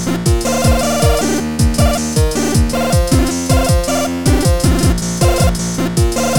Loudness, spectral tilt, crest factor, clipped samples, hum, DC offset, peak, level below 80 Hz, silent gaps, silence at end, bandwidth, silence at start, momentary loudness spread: -14 LUFS; -5 dB/octave; 12 dB; under 0.1%; none; 2%; -2 dBFS; -18 dBFS; none; 0 s; 18 kHz; 0 s; 2 LU